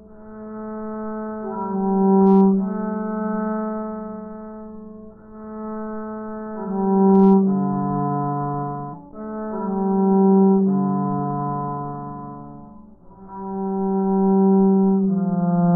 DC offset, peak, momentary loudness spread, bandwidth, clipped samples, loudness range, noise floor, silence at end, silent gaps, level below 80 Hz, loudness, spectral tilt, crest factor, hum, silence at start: under 0.1%; -6 dBFS; 20 LU; 1.8 kHz; under 0.1%; 8 LU; -44 dBFS; 0 s; none; -54 dBFS; -20 LUFS; -8.5 dB/octave; 14 dB; none; 0 s